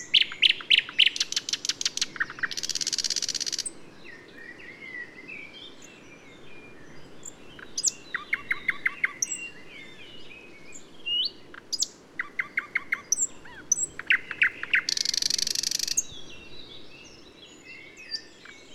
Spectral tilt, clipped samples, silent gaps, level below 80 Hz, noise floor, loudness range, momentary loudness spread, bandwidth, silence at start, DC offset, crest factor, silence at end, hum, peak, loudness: 1.5 dB/octave; under 0.1%; none; -64 dBFS; -49 dBFS; 11 LU; 24 LU; 16 kHz; 0 s; under 0.1%; 24 dB; 0 s; none; -6 dBFS; -26 LUFS